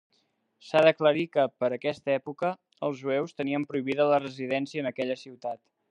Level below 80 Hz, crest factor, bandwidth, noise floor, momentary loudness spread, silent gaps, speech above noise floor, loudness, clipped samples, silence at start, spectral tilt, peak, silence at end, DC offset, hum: -80 dBFS; 22 dB; 9.4 kHz; -72 dBFS; 12 LU; none; 45 dB; -28 LUFS; under 0.1%; 0.65 s; -6.5 dB/octave; -6 dBFS; 0.35 s; under 0.1%; none